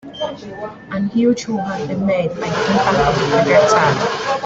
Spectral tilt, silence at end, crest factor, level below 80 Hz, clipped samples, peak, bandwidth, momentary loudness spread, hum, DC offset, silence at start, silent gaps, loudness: -5.5 dB/octave; 0 s; 16 dB; -44 dBFS; under 0.1%; -2 dBFS; 8.2 kHz; 14 LU; none; under 0.1%; 0.05 s; none; -16 LUFS